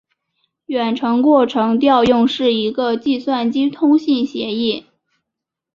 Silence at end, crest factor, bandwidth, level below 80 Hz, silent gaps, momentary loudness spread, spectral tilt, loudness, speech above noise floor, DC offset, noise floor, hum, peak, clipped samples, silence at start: 0.95 s; 16 dB; 7.2 kHz; -56 dBFS; none; 8 LU; -6 dB/octave; -16 LUFS; 67 dB; under 0.1%; -82 dBFS; none; -2 dBFS; under 0.1%; 0.7 s